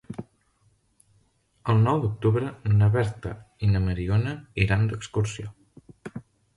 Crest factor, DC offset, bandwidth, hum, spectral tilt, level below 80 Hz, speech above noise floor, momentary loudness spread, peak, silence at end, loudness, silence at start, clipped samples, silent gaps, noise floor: 18 dB; under 0.1%; 11 kHz; none; -7.5 dB/octave; -42 dBFS; 42 dB; 19 LU; -8 dBFS; 0.35 s; -25 LUFS; 0.1 s; under 0.1%; none; -66 dBFS